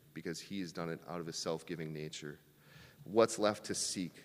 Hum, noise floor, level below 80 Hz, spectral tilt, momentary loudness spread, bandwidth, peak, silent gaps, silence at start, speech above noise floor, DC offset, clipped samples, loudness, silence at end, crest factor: none; -60 dBFS; -76 dBFS; -4 dB/octave; 14 LU; 15.5 kHz; -14 dBFS; none; 0.15 s; 22 dB; under 0.1%; under 0.1%; -38 LUFS; 0 s; 24 dB